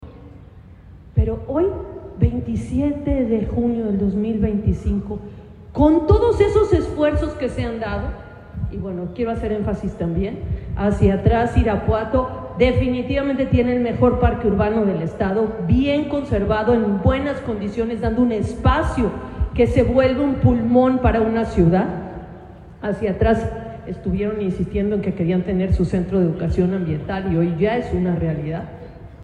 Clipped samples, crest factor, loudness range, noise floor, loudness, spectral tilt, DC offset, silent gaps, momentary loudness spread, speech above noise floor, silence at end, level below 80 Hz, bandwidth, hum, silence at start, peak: under 0.1%; 16 dB; 5 LU; -42 dBFS; -20 LUFS; -8.5 dB/octave; under 0.1%; none; 12 LU; 23 dB; 0 s; -30 dBFS; 10 kHz; none; 0 s; -4 dBFS